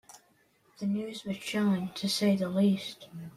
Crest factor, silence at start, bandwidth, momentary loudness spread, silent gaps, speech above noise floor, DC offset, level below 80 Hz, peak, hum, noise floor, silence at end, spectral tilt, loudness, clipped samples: 16 dB; 0.1 s; 14.5 kHz; 10 LU; none; 37 dB; under 0.1%; -72 dBFS; -16 dBFS; none; -67 dBFS; 0.05 s; -5.5 dB/octave; -30 LUFS; under 0.1%